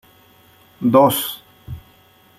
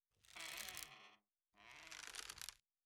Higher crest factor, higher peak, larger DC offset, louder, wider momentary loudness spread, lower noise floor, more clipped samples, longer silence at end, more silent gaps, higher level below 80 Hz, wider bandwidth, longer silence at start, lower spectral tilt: second, 20 dB vs 28 dB; first, -2 dBFS vs -28 dBFS; neither; first, -16 LUFS vs -52 LUFS; first, 23 LU vs 14 LU; second, -52 dBFS vs -76 dBFS; neither; first, 0.6 s vs 0.3 s; neither; first, -50 dBFS vs -78 dBFS; second, 16 kHz vs 19.5 kHz; first, 0.8 s vs 0.25 s; first, -5 dB/octave vs 0.5 dB/octave